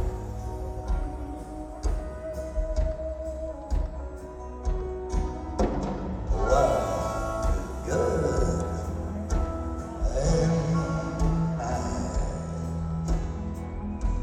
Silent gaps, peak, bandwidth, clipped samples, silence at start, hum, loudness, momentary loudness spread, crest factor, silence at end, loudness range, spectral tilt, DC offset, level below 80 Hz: none; -10 dBFS; 12.5 kHz; under 0.1%; 0 s; none; -30 LUFS; 11 LU; 18 dB; 0 s; 6 LU; -7 dB/octave; under 0.1%; -32 dBFS